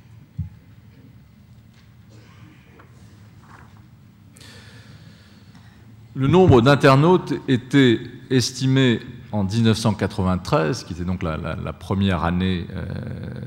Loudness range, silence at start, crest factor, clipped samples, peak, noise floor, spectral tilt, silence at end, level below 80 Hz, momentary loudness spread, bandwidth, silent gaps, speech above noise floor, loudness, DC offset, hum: 7 LU; 0.4 s; 18 dB; under 0.1%; -4 dBFS; -48 dBFS; -6.5 dB/octave; 0 s; -48 dBFS; 17 LU; 15.5 kHz; none; 29 dB; -19 LUFS; under 0.1%; none